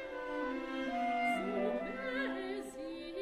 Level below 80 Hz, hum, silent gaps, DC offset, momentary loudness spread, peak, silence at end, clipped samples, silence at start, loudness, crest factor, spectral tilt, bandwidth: -64 dBFS; none; none; under 0.1%; 9 LU; -24 dBFS; 0 s; under 0.1%; 0 s; -38 LUFS; 14 dB; -5 dB/octave; 14.5 kHz